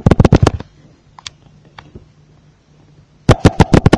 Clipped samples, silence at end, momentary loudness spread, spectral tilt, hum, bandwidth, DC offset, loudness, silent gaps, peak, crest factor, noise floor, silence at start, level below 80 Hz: 1%; 0 s; 23 LU; -7 dB/octave; none; 11 kHz; under 0.1%; -12 LUFS; none; 0 dBFS; 14 dB; -48 dBFS; 0.05 s; -24 dBFS